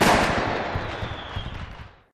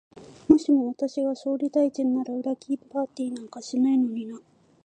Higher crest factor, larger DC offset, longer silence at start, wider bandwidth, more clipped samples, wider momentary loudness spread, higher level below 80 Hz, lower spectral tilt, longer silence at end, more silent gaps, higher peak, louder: about the same, 18 dB vs 22 dB; neither; second, 0 s vs 0.15 s; first, 14 kHz vs 9.2 kHz; neither; first, 18 LU vs 14 LU; first, -38 dBFS vs -62 dBFS; second, -4.5 dB/octave vs -6 dB/octave; second, 0.2 s vs 0.45 s; neither; second, -8 dBFS vs -2 dBFS; about the same, -26 LUFS vs -25 LUFS